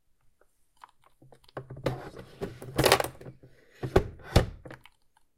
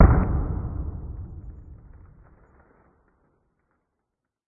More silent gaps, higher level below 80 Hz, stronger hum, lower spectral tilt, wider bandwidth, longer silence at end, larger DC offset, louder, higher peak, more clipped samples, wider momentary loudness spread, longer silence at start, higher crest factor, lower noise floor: neither; second, -42 dBFS vs -30 dBFS; neither; second, -4.5 dB/octave vs -14.5 dB/octave; first, 16.5 kHz vs 2.6 kHz; second, 0.6 s vs 2.75 s; neither; about the same, -29 LUFS vs -27 LUFS; about the same, 0 dBFS vs 0 dBFS; neither; about the same, 25 LU vs 25 LU; first, 1.55 s vs 0 s; first, 32 dB vs 24 dB; second, -65 dBFS vs -82 dBFS